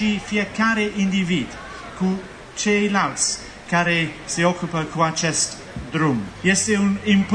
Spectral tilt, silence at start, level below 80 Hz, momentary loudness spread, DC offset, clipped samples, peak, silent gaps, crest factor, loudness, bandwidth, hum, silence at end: -4 dB/octave; 0 s; -48 dBFS; 10 LU; under 0.1%; under 0.1%; -6 dBFS; none; 16 dB; -21 LUFS; 10 kHz; none; 0 s